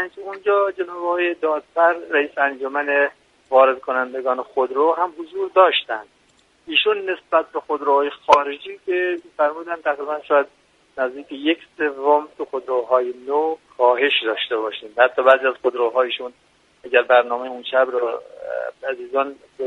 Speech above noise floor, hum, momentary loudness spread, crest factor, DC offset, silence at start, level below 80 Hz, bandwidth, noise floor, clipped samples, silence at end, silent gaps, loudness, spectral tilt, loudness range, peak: 38 dB; none; 12 LU; 20 dB; under 0.1%; 0 s; -68 dBFS; 9.2 kHz; -58 dBFS; under 0.1%; 0 s; none; -20 LUFS; -3 dB/octave; 3 LU; 0 dBFS